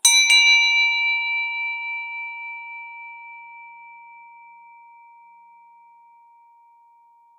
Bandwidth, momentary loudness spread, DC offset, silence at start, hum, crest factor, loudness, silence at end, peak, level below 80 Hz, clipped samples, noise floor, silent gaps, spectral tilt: 16 kHz; 27 LU; under 0.1%; 0.05 s; none; 22 dB; -17 LUFS; 3.4 s; -2 dBFS; under -90 dBFS; under 0.1%; -55 dBFS; none; 8.5 dB/octave